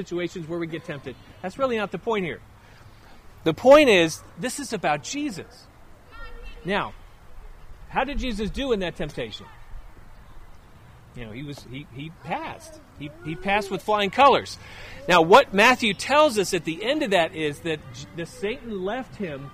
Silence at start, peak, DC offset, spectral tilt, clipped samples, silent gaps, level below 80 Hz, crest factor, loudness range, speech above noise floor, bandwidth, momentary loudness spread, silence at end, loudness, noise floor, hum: 0 s; -4 dBFS; under 0.1%; -4 dB/octave; under 0.1%; none; -44 dBFS; 20 dB; 17 LU; 25 dB; 15.5 kHz; 22 LU; 0 s; -22 LUFS; -48 dBFS; none